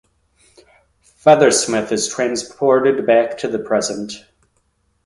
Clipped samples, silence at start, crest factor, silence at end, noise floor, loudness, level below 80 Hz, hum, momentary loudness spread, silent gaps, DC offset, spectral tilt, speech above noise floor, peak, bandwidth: under 0.1%; 1.25 s; 18 dB; 0.9 s; -64 dBFS; -16 LUFS; -58 dBFS; none; 12 LU; none; under 0.1%; -3.5 dB/octave; 48 dB; 0 dBFS; 11.5 kHz